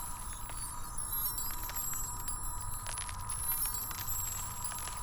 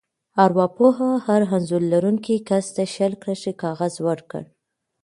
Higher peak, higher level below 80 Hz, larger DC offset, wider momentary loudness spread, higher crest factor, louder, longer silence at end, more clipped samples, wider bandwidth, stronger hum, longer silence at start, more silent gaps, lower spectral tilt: second, -20 dBFS vs 0 dBFS; first, -44 dBFS vs -66 dBFS; neither; about the same, 8 LU vs 10 LU; about the same, 18 dB vs 20 dB; second, -36 LUFS vs -21 LUFS; second, 0 s vs 0.6 s; neither; first, over 20 kHz vs 11.5 kHz; neither; second, 0 s vs 0.35 s; neither; second, -1.5 dB/octave vs -6.5 dB/octave